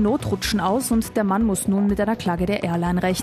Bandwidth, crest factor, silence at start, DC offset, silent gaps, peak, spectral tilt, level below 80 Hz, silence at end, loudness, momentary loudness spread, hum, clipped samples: 14 kHz; 14 dB; 0 s; under 0.1%; none; -8 dBFS; -5.5 dB/octave; -38 dBFS; 0 s; -21 LUFS; 2 LU; none; under 0.1%